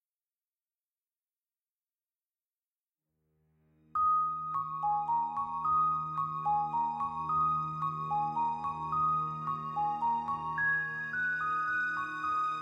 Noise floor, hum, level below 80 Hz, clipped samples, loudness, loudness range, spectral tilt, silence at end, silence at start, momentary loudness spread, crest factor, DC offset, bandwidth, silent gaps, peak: under -90 dBFS; none; -66 dBFS; under 0.1%; -32 LUFS; 4 LU; -6 dB/octave; 0 s; 3.95 s; 6 LU; 12 dB; under 0.1%; 9 kHz; none; -22 dBFS